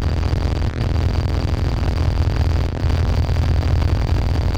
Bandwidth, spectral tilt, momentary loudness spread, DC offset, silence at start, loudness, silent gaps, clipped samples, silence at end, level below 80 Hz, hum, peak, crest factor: 8.6 kHz; -7 dB/octave; 2 LU; under 0.1%; 0 s; -20 LUFS; none; under 0.1%; 0 s; -20 dBFS; none; -6 dBFS; 12 dB